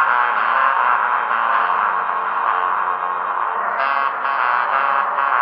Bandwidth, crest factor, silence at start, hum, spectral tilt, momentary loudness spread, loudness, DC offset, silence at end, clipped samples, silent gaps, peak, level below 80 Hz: 5.4 kHz; 16 dB; 0 s; none; -5 dB/octave; 5 LU; -18 LUFS; under 0.1%; 0 s; under 0.1%; none; -2 dBFS; -74 dBFS